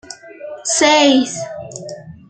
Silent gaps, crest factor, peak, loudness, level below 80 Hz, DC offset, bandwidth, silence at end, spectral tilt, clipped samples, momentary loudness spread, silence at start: none; 16 dB; -2 dBFS; -13 LUFS; -60 dBFS; under 0.1%; 9.2 kHz; 0.15 s; -2 dB/octave; under 0.1%; 22 LU; 0.1 s